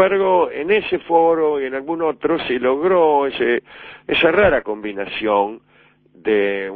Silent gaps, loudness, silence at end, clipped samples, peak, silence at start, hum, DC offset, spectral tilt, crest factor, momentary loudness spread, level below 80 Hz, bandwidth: none; -18 LUFS; 0 s; under 0.1%; 0 dBFS; 0 s; none; under 0.1%; -8.5 dB/octave; 16 dB; 10 LU; -48 dBFS; 4.6 kHz